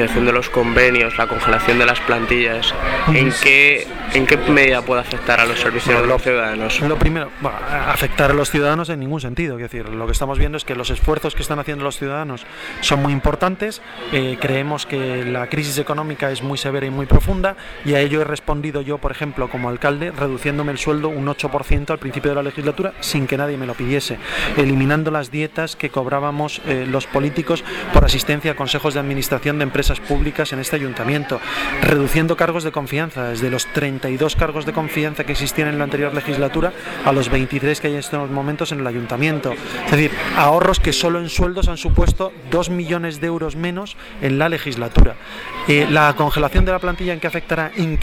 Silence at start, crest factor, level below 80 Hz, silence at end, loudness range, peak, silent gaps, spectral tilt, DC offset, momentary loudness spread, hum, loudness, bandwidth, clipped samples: 0 s; 18 dB; -26 dBFS; 0 s; 8 LU; 0 dBFS; none; -5 dB/octave; under 0.1%; 9 LU; none; -18 LUFS; 18.5 kHz; under 0.1%